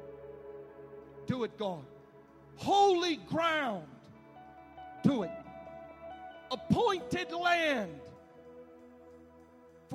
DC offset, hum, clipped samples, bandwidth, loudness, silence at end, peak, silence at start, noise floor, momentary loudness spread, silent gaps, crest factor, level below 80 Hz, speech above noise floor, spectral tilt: under 0.1%; none; under 0.1%; 15 kHz; -32 LUFS; 0 s; -12 dBFS; 0 s; -58 dBFS; 25 LU; none; 22 dB; -66 dBFS; 27 dB; -5.5 dB/octave